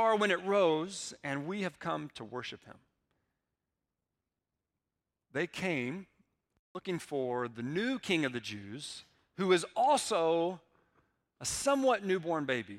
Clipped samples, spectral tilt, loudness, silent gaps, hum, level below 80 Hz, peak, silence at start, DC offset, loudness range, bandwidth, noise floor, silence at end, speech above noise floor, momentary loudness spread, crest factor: under 0.1%; -4 dB/octave; -33 LUFS; 6.59-6.75 s; none; -72 dBFS; -14 dBFS; 0 s; under 0.1%; 12 LU; 15.5 kHz; -89 dBFS; 0 s; 56 dB; 15 LU; 20 dB